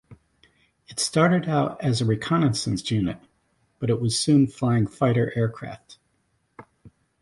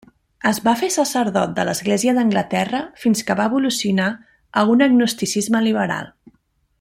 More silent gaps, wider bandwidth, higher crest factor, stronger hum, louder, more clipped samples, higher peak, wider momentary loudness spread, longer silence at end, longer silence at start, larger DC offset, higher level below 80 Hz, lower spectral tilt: neither; second, 11.5 kHz vs 16 kHz; about the same, 20 dB vs 16 dB; neither; second, -23 LUFS vs -19 LUFS; neither; about the same, -6 dBFS vs -4 dBFS; first, 12 LU vs 8 LU; second, 0.35 s vs 0.7 s; second, 0.1 s vs 0.45 s; neither; about the same, -54 dBFS vs -58 dBFS; about the same, -5.5 dB/octave vs -4.5 dB/octave